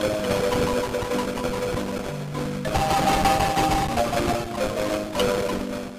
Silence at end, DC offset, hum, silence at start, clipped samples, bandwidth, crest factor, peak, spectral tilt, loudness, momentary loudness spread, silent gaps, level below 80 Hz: 0 s; 0.1%; none; 0 s; under 0.1%; 15.5 kHz; 14 dB; -8 dBFS; -4.5 dB/octave; -24 LUFS; 8 LU; none; -38 dBFS